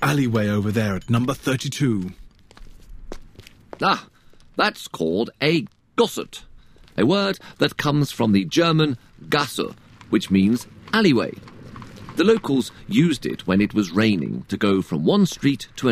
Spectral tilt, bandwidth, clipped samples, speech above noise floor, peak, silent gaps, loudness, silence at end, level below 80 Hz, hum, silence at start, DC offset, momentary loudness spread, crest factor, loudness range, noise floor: -6 dB/octave; 15.5 kHz; under 0.1%; 26 dB; -2 dBFS; none; -21 LUFS; 0 s; -48 dBFS; none; 0 s; under 0.1%; 14 LU; 20 dB; 5 LU; -46 dBFS